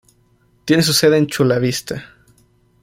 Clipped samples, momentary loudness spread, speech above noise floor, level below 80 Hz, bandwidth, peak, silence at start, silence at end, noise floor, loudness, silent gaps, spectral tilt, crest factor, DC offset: under 0.1%; 17 LU; 41 dB; -52 dBFS; 16.5 kHz; -2 dBFS; 0.65 s; 0.75 s; -57 dBFS; -15 LUFS; none; -4.5 dB/octave; 16 dB; under 0.1%